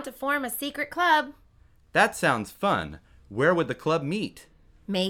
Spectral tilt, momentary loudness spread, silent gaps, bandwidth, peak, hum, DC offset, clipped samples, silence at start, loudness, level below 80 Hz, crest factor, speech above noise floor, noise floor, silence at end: -4.5 dB/octave; 14 LU; none; 19 kHz; -8 dBFS; none; under 0.1%; under 0.1%; 0 s; -26 LUFS; -56 dBFS; 20 dB; 32 dB; -58 dBFS; 0 s